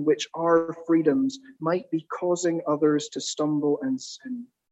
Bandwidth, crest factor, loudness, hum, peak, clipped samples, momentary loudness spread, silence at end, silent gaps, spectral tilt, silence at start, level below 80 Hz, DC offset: 8.4 kHz; 16 dB; -25 LUFS; none; -8 dBFS; under 0.1%; 10 LU; 0.25 s; none; -5 dB/octave; 0 s; -76 dBFS; under 0.1%